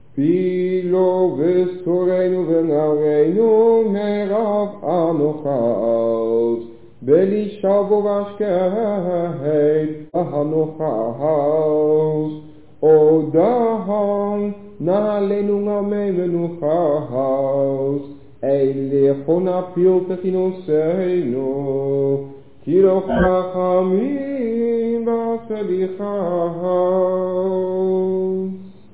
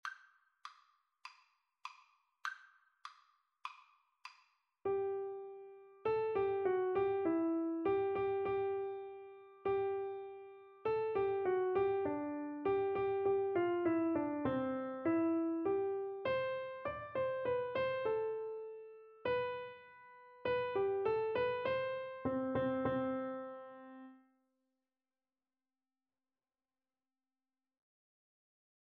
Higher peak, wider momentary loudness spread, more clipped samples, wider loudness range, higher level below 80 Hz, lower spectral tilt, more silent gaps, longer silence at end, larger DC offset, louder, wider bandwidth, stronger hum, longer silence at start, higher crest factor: first, -4 dBFS vs -22 dBFS; second, 7 LU vs 21 LU; neither; second, 3 LU vs 13 LU; first, -48 dBFS vs -72 dBFS; first, -12.5 dB/octave vs -5 dB/octave; neither; second, 0.25 s vs 4.75 s; first, 0.7% vs under 0.1%; first, -18 LUFS vs -37 LUFS; second, 4 kHz vs 6.6 kHz; neither; about the same, 0.15 s vs 0.05 s; about the same, 14 dB vs 16 dB